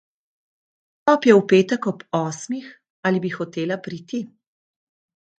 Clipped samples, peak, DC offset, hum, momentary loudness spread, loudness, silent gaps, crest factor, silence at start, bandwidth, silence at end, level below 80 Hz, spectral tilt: under 0.1%; 0 dBFS; under 0.1%; none; 16 LU; -21 LUFS; 2.90-3.03 s; 22 dB; 1.05 s; 9 kHz; 1.15 s; -70 dBFS; -6 dB/octave